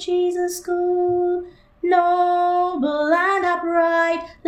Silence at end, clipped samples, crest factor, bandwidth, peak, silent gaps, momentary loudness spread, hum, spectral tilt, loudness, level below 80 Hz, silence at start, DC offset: 0 s; under 0.1%; 14 dB; 15 kHz; -6 dBFS; none; 6 LU; none; -4 dB/octave; -20 LUFS; -56 dBFS; 0 s; under 0.1%